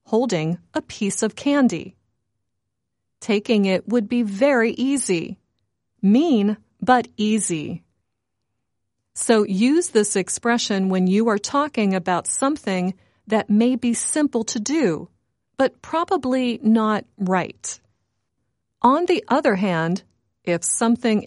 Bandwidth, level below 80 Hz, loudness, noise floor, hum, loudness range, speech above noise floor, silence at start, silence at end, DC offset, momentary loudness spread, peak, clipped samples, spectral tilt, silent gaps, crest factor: 11.5 kHz; -64 dBFS; -21 LUFS; -79 dBFS; none; 3 LU; 60 dB; 0.1 s; 0 s; under 0.1%; 10 LU; -2 dBFS; under 0.1%; -4.5 dB/octave; none; 18 dB